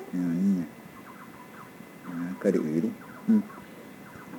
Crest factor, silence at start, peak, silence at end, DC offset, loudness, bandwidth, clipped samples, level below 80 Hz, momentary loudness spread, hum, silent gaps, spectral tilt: 20 dB; 0 s; -10 dBFS; 0 s; under 0.1%; -28 LUFS; 19 kHz; under 0.1%; -72 dBFS; 20 LU; none; none; -8 dB/octave